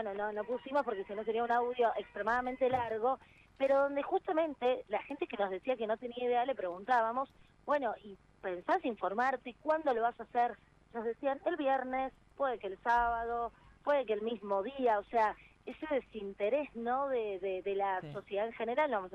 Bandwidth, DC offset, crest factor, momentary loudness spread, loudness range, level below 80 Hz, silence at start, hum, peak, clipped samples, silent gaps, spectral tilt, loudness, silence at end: 8.4 kHz; under 0.1%; 16 dB; 9 LU; 2 LU; -66 dBFS; 0 s; none; -20 dBFS; under 0.1%; none; -6 dB/octave; -35 LUFS; 0 s